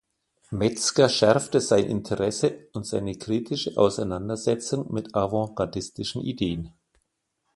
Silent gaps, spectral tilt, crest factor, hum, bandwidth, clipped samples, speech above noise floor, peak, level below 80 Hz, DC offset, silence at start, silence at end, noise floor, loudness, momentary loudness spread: none; -4.5 dB/octave; 22 dB; none; 11.5 kHz; under 0.1%; 52 dB; -4 dBFS; -52 dBFS; under 0.1%; 0.5 s; 0.85 s; -77 dBFS; -25 LUFS; 10 LU